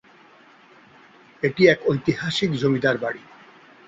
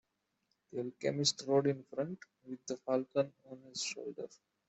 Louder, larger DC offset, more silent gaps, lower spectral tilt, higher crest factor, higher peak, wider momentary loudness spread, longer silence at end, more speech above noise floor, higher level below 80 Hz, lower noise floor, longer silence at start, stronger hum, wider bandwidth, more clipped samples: first, -21 LUFS vs -36 LUFS; neither; neither; first, -6 dB/octave vs -4 dB/octave; about the same, 20 dB vs 22 dB; first, -2 dBFS vs -16 dBFS; second, 10 LU vs 17 LU; first, 0.7 s vs 0.35 s; second, 31 dB vs 45 dB; first, -60 dBFS vs -82 dBFS; second, -51 dBFS vs -82 dBFS; first, 1.4 s vs 0.75 s; neither; about the same, 7.8 kHz vs 8.2 kHz; neither